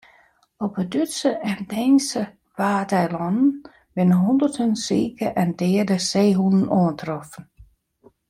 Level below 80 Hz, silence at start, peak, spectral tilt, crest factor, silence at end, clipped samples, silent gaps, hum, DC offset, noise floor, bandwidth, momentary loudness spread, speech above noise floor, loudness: -58 dBFS; 0.6 s; -8 dBFS; -6 dB/octave; 14 dB; 0.65 s; under 0.1%; none; none; under 0.1%; -58 dBFS; 15 kHz; 12 LU; 37 dB; -21 LUFS